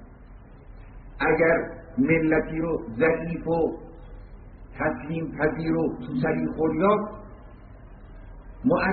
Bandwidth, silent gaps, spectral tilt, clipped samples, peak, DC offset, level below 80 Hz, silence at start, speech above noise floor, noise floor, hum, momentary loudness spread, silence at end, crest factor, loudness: 4.5 kHz; none; -6.5 dB/octave; under 0.1%; -8 dBFS; under 0.1%; -44 dBFS; 0 s; 22 dB; -46 dBFS; none; 24 LU; 0 s; 18 dB; -25 LUFS